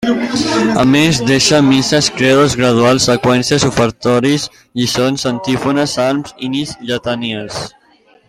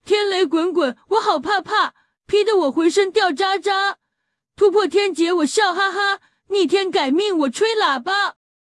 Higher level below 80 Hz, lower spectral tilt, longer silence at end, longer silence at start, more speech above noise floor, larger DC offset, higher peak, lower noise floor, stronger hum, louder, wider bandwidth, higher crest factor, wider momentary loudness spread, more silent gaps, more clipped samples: first, -42 dBFS vs -64 dBFS; first, -4.5 dB/octave vs -2 dB/octave; first, 0.6 s vs 0.4 s; about the same, 0 s vs 0.05 s; second, 37 dB vs 59 dB; neither; first, 0 dBFS vs -6 dBFS; second, -50 dBFS vs -77 dBFS; neither; first, -13 LUFS vs -18 LUFS; first, 15.5 kHz vs 12 kHz; about the same, 14 dB vs 14 dB; first, 10 LU vs 4 LU; neither; neither